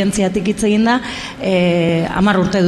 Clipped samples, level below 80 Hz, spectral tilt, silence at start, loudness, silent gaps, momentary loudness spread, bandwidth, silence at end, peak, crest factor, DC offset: under 0.1%; -40 dBFS; -5.5 dB/octave; 0 s; -16 LUFS; none; 5 LU; 13.5 kHz; 0 s; -2 dBFS; 12 dB; under 0.1%